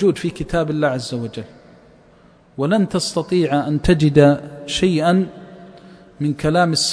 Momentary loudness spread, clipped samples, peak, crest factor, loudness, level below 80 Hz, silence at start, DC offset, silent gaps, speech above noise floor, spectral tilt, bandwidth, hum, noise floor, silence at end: 13 LU; under 0.1%; 0 dBFS; 18 dB; -18 LUFS; -38 dBFS; 0 s; under 0.1%; none; 32 dB; -5.5 dB/octave; 11 kHz; none; -50 dBFS; 0 s